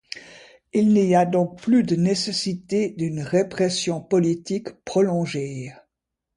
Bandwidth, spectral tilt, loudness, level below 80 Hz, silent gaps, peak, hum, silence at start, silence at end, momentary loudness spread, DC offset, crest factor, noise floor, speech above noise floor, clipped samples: 11.5 kHz; -6 dB/octave; -22 LUFS; -62 dBFS; none; -6 dBFS; none; 0.15 s; 0.65 s; 11 LU; under 0.1%; 16 dB; -82 dBFS; 61 dB; under 0.1%